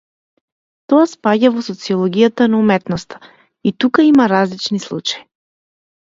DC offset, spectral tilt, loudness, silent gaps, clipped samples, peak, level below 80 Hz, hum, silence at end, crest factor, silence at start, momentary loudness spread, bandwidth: under 0.1%; -6 dB/octave; -15 LUFS; none; under 0.1%; 0 dBFS; -58 dBFS; none; 0.95 s; 16 dB; 0.9 s; 12 LU; 7.8 kHz